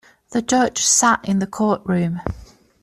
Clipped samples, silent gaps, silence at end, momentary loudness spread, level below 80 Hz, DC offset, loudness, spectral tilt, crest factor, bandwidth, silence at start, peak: under 0.1%; none; 0.4 s; 13 LU; -44 dBFS; under 0.1%; -18 LUFS; -3.5 dB/octave; 16 dB; 14 kHz; 0.3 s; -4 dBFS